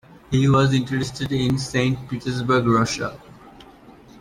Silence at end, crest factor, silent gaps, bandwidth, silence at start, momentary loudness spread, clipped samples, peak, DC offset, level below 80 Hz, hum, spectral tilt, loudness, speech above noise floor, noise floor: 0.3 s; 16 dB; none; 12.5 kHz; 0.1 s; 10 LU; under 0.1%; -6 dBFS; under 0.1%; -48 dBFS; none; -6 dB/octave; -21 LUFS; 26 dB; -46 dBFS